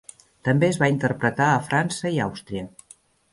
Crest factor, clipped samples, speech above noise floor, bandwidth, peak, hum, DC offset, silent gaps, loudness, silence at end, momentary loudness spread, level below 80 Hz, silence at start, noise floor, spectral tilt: 18 dB; under 0.1%; 32 dB; 11.5 kHz; -6 dBFS; none; under 0.1%; none; -22 LUFS; 0.65 s; 13 LU; -56 dBFS; 0.45 s; -54 dBFS; -6 dB/octave